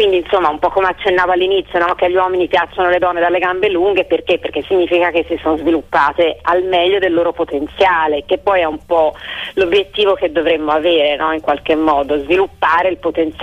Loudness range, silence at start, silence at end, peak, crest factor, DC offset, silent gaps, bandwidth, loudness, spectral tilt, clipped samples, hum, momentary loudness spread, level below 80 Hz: 1 LU; 0 s; 0 s; -2 dBFS; 12 dB; under 0.1%; none; 8.4 kHz; -14 LUFS; -5.5 dB/octave; under 0.1%; none; 4 LU; -42 dBFS